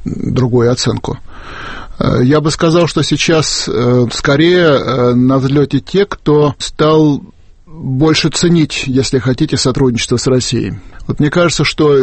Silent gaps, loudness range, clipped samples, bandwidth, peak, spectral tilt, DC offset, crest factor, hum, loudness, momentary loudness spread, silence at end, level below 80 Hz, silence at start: none; 2 LU; under 0.1%; 8.8 kHz; 0 dBFS; -5.5 dB/octave; under 0.1%; 12 dB; none; -12 LUFS; 11 LU; 0 s; -34 dBFS; 0 s